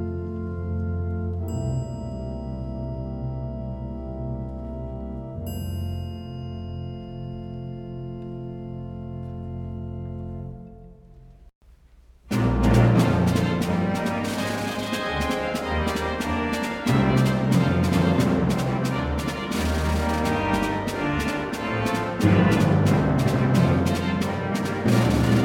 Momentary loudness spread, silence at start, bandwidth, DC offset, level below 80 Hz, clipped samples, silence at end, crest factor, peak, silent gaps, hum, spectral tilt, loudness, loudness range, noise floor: 15 LU; 0 s; 17 kHz; under 0.1%; -36 dBFS; under 0.1%; 0 s; 18 dB; -6 dBFS; 11.55-11.61 s; none; -6.5 dB/octave; -25 LUFS; 13 LU; -52 dBFS